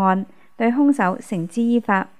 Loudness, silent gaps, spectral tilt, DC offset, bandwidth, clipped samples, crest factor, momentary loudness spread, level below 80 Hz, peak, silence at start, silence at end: -20 LUFS; none; -7 dB/octave; 0.5%; 12 kHz; under 0.1%; 16 dB; 9 LU; -72 dBFS; -4 dBFS; 0 s; 0.15 s